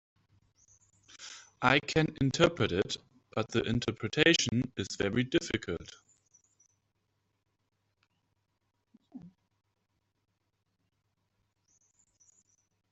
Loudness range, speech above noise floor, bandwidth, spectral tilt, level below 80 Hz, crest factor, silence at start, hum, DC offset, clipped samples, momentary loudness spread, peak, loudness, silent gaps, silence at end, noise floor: 9 LU; 50 dB; 8.2 kHz; -4.5 dB/octave; -60 dBFS; 26 dB; 1.2 s; none; under 0.1%; under 0.1%; 16 LU; -10 dBFS; -30 LUFS; none; 3.65 s; -80 dBFS